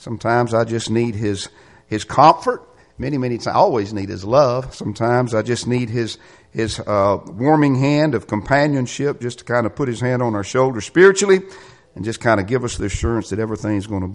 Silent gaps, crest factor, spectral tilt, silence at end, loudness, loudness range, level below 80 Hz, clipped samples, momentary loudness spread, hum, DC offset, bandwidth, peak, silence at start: none; 18 dB; -6 dB/octave; 0 s; -18 LUFS; 2 LU; -42 dBFS; under 0.1%; 14 LU; none; under 0.1%; 11.5 kHz; 0 dBFS; 0 s